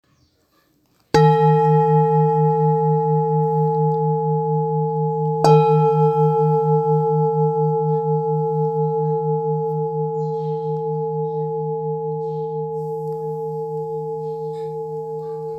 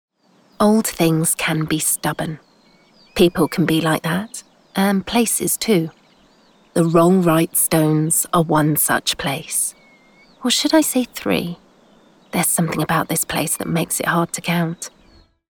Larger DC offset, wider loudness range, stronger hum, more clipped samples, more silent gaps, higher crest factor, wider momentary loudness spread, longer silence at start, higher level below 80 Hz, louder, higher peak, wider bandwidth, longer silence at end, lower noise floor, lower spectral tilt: neither; first, 8 LU vs 4 LU; neither; neither; neither; about the same, 18 dB vs 16 dB; about the same, 11 LU vs 10 LU; first, 1.15 s vs 0.6 s; second, -58 dBFS vs -50 dBFS; about the same, -19 LUFS vs -18 LUFS; first, 0 dBFS vs -4 dBFS; second, 8.2 kHz vs over 20 kHz; second, 0 s vs 0.65 s; first, -62 dBFS vs -55 dBFS; first, -9 dB/octave vs -4 dB/octave